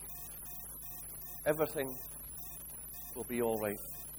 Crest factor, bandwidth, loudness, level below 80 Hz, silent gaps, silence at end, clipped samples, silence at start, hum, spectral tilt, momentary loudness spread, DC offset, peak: 22 dB; over 20 kHz; -39 LUFS; -58 dBFS; none; 0 s; under 0.1%; 0 s; none; -4.5 dB/octave; 9 LU; under 0.1%; -18 dBFS